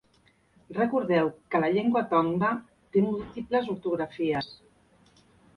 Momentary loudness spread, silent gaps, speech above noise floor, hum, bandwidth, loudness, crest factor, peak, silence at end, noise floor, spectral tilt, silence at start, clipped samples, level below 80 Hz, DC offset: 8 LU; none; 38 dB; none; 10.5 kHz; -27 LUFS; 18 dB; -12 dBFS; 1 s; -64 dBFS; -8.5 dB/octave; 0.7 s; under 0.1%; -62 dBFS; under 0.1%